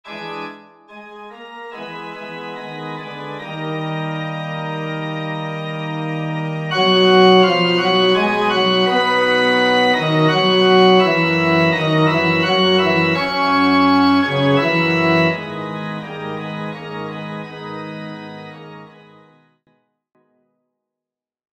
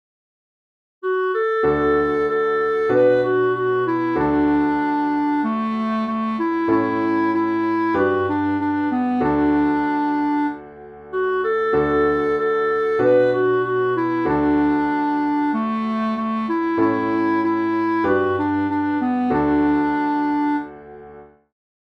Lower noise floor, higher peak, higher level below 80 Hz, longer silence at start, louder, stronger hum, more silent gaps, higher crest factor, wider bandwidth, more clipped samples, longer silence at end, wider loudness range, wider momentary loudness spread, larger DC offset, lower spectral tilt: first, -87 dBFS vs -43 dBFS; first, -2 dBFS vs -6 dBFS; second, -60 dBFS vs -48 dBFS; second, 0.05 s vs 1.05 s; first, -16 LUFS vs -20 LUFS; neither; neither; about the same, 16 dB vs 14 dB; first, 16 kHz vs 6 kHz; neither; first, 2.65 s vs 0.55 s; first, 17 LU vs 2 LU; first, 18 LU vs 5 LU; neither; second, -6 dB/octave vs -8.5 dB/octave